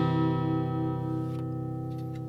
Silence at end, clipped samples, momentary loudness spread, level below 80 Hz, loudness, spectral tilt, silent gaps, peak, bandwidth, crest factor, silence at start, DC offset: 0 s; under 0.1%; 8 LU; -58 dBFS; -31 LUFS; -9.5 dB/octave; none; -16 dBFS; 5.6 kHz; 14 dB; 0 s; under 0.1%